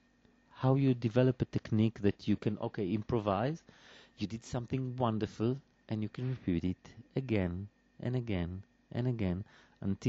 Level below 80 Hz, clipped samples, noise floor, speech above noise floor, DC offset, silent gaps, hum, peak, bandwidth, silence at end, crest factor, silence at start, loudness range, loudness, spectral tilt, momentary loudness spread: -60 dBFS; under 0.1%; -67 dBFS; 34 dB; under 0.1%; none; none; -14 dBFS; 7.8 kHz; 0 s; 20 dB; 0.55 s; 5 LU; -35 LUFS; -7.5 dB/octave; 12 LU